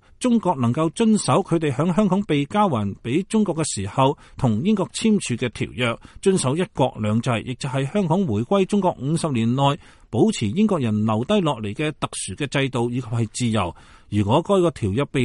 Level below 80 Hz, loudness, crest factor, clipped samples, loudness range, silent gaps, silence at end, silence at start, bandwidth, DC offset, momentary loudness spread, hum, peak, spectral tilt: -50 dBFS; -22 LUFS; 16 dB; under 0.1%; 2 LU; none; 0 s; 0.2 s; 11.5 kHz; under 0.1%; 6 LU; none; -4 dBFS; -6 dB/octave